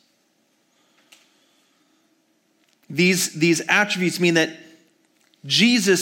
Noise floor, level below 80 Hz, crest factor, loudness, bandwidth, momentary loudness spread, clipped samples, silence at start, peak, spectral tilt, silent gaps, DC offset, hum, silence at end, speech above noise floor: -65 dBFS; -76 dBFS; 20 dB; -19 LUFS; 17 kHz; 8 LU; under 0.1%; 2.9 s; -4 dBFS; -3.5 dB/octave; none; under 0.1%; none; 0 s; 46 dB